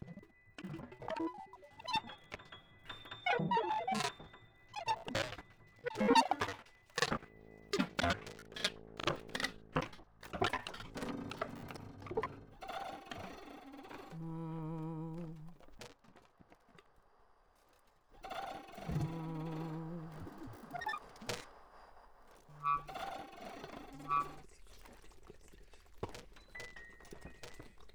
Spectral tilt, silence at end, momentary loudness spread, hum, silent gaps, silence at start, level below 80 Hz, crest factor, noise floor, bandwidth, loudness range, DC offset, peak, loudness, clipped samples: -4.5 dB/octave; 0 s; 20 LU; none; none; 0 s; -62 dBFS; 26 dB; -69 dBFS; over 20 kHz; 12 LU; under 0.1%; -16 dBFS; -40 LUFS; under 0.1%